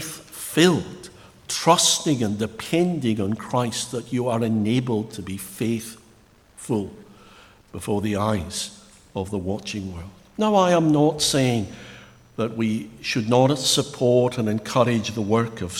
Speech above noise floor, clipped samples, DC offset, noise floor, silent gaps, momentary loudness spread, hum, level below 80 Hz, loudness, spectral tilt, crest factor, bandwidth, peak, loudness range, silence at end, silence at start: 32 dB; under 0.1%; under 0.1%; -54 dBFS; none; 17 LU; none; -54 dBFS; -22 LUFS; -4.5 dB/octave; 22 dB; 18 kHz; -2 dBFS; 7 LU; 0 s; 0 s